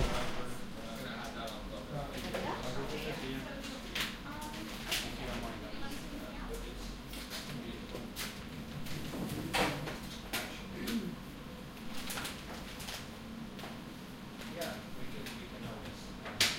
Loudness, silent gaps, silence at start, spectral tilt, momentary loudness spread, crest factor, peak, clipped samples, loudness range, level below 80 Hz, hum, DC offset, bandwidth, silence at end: -41 LUFS; none; 0 s; -3.5 dB/octave; 9 LU; 26 dB; -14 dBFS; under 0.1%; 5 LU; -50 dBFS; none; under 0.1%; 16.5 kHz; 0 s